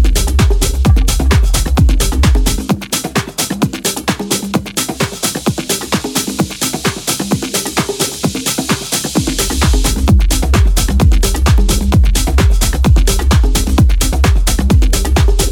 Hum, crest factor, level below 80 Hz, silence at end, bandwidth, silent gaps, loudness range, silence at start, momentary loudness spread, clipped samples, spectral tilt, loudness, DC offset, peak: none; 12 dB; -14 dBFS; 0 s; 18.5 kHz; none; 4 LU; 0 s; 5 LU; under 0.1%; -4.5 dB/octave; -14 LUFS; under 0.1%; 0 dBFS